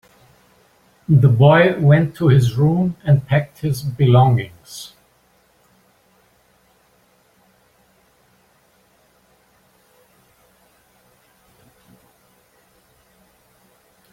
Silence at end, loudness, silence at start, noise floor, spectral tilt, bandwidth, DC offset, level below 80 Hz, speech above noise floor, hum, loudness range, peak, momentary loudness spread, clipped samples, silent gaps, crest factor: 9.25 s; -15 LUFS; 1.1 s; -58 dBFS; -8 dB/octave; 12.5 kHz; under 0.1%; -52 dBFS; 43 dB; none; 6 LU; -2 dBFS; 23 LU; under 0.1%; none; 18 dB